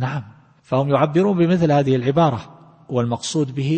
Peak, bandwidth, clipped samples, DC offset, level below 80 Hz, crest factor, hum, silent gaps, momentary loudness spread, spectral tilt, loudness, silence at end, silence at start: -4 dBFS; 8.8 kHz; under 0.1%; under 0.1%; -54 dBFS; 16 dB; none; none; 9 LU; -7 dB/octave; -19 LUFS; 0 s; 0 s